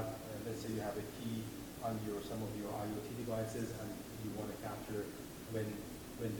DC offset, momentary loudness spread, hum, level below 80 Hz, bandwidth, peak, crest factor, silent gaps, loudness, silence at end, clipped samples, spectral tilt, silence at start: under 0.1%; 5 LU; none; -62 dBFS; 19.5 kHz; -28 dBFS; 14 dB; none; -43 LUFS; 0 s; under 0.1%; -5.5 dB/octave; 0 s